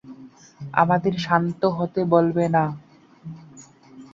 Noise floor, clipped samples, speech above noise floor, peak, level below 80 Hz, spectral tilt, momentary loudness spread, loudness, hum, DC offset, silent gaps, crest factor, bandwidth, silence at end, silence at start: -47 dBFS; under 0.1%; 27 dB; -2 dBFS; -60 dBFS; -7.5 dB/octave; 21 LU; -21 LUFS; none; under 0.1%; none; 22 dB; 7.6 kHz; 0.1 s; 0.05 s